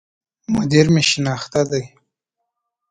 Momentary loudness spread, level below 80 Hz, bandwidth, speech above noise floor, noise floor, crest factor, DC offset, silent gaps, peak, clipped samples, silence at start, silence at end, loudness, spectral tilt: 10 LU; -50 dBFS; 9.6 kHz; 62 dB; -78 dBFS; 20 dB; under 0.1%; none; 0 dBFS; under 0.1%; 0.5 s; 1.05 s; -17 LUFS; -5 dB/octave